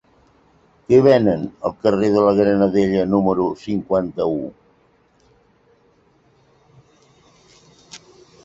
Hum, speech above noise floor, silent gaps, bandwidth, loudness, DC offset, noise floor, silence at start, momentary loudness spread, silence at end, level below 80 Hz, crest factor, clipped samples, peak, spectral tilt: none; 41 dB; none; 7.8 kHz; -17 LUFS; under 0.1%; -58 dBFS; 0.9 s; 10 LU; 0.45 s; -52 dBFS; 18 dB; under 0.1%; -2 dBFS; -8 dB/octave